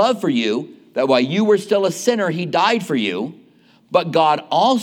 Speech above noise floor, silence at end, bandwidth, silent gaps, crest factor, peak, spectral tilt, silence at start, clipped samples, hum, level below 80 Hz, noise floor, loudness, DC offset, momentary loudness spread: 34 dB; 0 s; 17 kHz; none; 16 dB; -2 dBFS; -5 dB/octave; 0 s; under 0.1%; none; -76 dBFS; -52 dBFS; -18 LUFS; under 0.1%; 7 LU